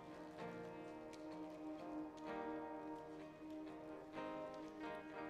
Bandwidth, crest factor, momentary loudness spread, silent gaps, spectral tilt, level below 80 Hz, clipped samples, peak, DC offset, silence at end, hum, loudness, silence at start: 13 kHz; 16 dB; 5 LU; none; -6 dB/octave; -78 dBFS; under 0.1%; -34 dBFS; under 0.1%; 0 s; none; -52 LUFS; 0 s